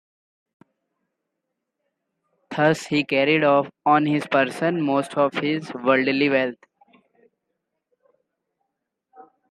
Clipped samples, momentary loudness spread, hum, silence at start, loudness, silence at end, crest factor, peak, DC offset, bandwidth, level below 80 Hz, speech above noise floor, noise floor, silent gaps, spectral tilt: under 0.1%; 6 LU; none; 2.5 s; -21 LUFS; 0.3 s; 20 dB; -4 dBFS; under 0.1%; 12 kHz; -72 dBFS; 60 dB; -80 dBFS; none; -6 dB/octave